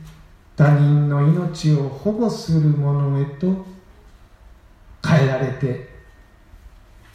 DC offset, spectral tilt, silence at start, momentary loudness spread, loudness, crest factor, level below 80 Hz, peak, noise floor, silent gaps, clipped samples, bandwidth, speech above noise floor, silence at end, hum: under 0.1%; -8 dB/octave; 0 s; 11 LU; -19 LUFS; 16 dB; -48 dBFS; -4 dBFS; -48 dBFS; none; under 0.1%; 8.8 kHz; 30 dB; 0.45 s; none